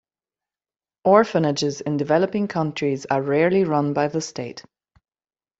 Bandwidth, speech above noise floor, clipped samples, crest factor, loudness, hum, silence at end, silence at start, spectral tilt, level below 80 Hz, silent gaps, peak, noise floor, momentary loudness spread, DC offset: 8 kHz; over 70 dB; under 0.1%; 20 dB; -21 LUFS; none; 1 s; 1.05 s; -6 dB/octave; -64 dBFS; none; -2 dBFS; under -90 dBFS; 11 LU; under 0.1%